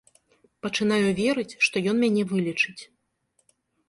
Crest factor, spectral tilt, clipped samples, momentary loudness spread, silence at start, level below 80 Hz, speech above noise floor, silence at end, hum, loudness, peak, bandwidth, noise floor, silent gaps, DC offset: 18 dB; -5 dB/octave; under 0.1%; 6 LU; 0.65 s; -64 dBFS; 47 dB; 1.05 s; none; -24 LUFS; -8 dBFS; 11.5 kHz; -72 dBFS; none; under 0.1%